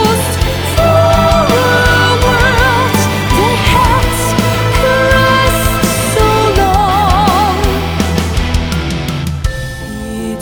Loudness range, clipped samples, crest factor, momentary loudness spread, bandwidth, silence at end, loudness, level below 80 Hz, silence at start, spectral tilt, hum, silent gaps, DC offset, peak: 3 LU; under 0.1%; 10 dB; 8 LU; over 20 kHz; 0 s; -11 LUFS; -20 dBFS; 0 s; -4.5 dB/octave; none; none; 0.4%; 0 dBFS